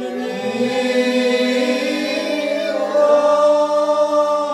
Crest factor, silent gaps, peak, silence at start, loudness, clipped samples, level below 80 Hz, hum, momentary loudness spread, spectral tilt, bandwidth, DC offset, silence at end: 12 dB; none; -4 dBFS; 0 s; -17 LUFS; under 0.1%; -68 dBFS; none; 6 LU; -3.5 dB/octave; 13 kHz; under 0.1%; 0 s